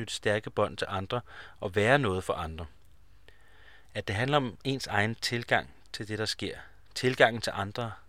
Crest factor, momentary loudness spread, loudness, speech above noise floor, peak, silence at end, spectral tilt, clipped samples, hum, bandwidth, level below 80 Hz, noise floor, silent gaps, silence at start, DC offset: 26 dB; 16 LU; -30 LUFS; 30 dB; -4 dBFS; 0.1 s; -4.5 dB/octave; under 0.1%; none; 16 kHz; -56 dBFS; -60 dBFS; none; 0 s; 0.2%